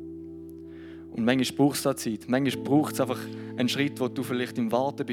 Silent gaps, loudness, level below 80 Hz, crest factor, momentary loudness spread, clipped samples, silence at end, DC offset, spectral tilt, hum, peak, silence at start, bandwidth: none; -27 LUFS; -68 dBFS; 20 dB; 18 LU; under 0.1%; 0 s; under 0.1%; -5 dB/octave; none; -8 dBFS; 0 s; 18.5 kHz